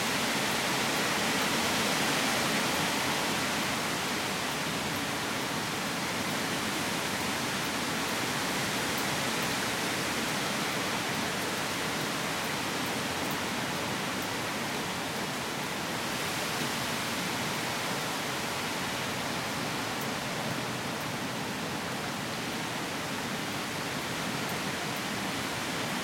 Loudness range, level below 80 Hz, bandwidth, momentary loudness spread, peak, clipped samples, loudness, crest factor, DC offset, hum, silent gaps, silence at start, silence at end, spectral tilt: 5 LU; -62 dBFS; 16.5 kHz; 6 LU; -16 dBFS; under 0.1%; -30 LUFS; 16 dB; under 0.1%; none; none; 0 s; 0 s; -2.5 dB/octave